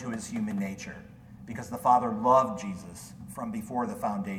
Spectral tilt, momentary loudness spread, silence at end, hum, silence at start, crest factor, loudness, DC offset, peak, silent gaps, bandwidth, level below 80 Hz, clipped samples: -6 dB/octave; 19 LU; 0 s; none; 0 s; 20 dB; -29 LUFS; under 0.1%; -10 dBFS; none; 17.5 kHz; -60 dBFS; under 0.1%